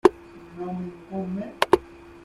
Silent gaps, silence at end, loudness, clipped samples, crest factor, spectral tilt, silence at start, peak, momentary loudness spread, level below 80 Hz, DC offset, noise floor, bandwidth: none; 0.05 s; -27 LUFS; under 0.1%; 24 dB; -6 dB/octave; 0.05 s; -2 dBFS; 22 LU; -54 dBFS; under 0.1%; -44 dBFS; 15 kHz